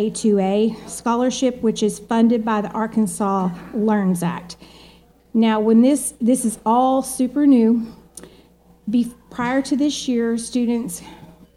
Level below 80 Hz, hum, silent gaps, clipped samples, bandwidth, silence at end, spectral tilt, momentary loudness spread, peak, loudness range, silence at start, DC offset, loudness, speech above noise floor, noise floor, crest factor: -54 dBFS; none; none; under 0.1%; 13.5 kHz; 0.3 s; -5.5 dB/octave; 11 LU; -4 dBFS; 5 LU; 0 s; under 0.1%; -19 LUFS; 33 dB; -51 dBFS; 14 dB